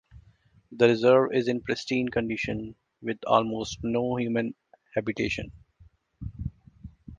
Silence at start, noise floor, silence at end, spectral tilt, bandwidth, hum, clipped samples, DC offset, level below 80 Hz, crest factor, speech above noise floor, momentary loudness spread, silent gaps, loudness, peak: 0.15 s; -60 dBFS; 0.05 s; -6 dB/octave; 9.2 kHz; none; under 0.1%; under 0.1%; -50 dBFS; 22 dB; 35 dB; 18 LU; none; -27 LUFS; -6 dBFS